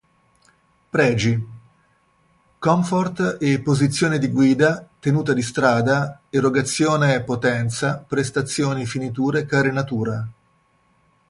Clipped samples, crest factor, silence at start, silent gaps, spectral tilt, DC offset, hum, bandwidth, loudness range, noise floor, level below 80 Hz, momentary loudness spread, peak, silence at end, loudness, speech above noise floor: under 0.1%; 18 dB; 0.95 s; none; -5.5 dB/octave; under 0.1%; none; 11.5 kHz; 4 LU; -61 dBFS; -54 dBFS; 7 LU; -2 dBFS; 1 s; -20 LUFS; 42 dB